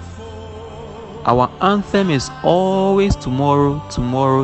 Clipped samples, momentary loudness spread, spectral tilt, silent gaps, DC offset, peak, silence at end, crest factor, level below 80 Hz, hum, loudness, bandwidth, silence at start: under 0.1%; 18 LU; -6.5 dB/octave; none; under 0.1%; 0 dBFS; 0 s; 16 dB; -34 dBFS; none; -17 LUFS; 8.8 kHz; 0 s